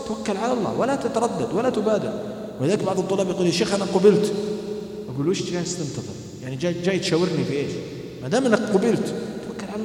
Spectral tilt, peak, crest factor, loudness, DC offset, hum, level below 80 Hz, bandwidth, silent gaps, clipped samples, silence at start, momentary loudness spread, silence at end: -5.5 dB/octave; -2 dBFS; 20 dB; -23 LUFS; under 0.1%; none; -58 dBFS; 15.5 kHz; none; under 0.1%; 0 s; 12 LU; 0 s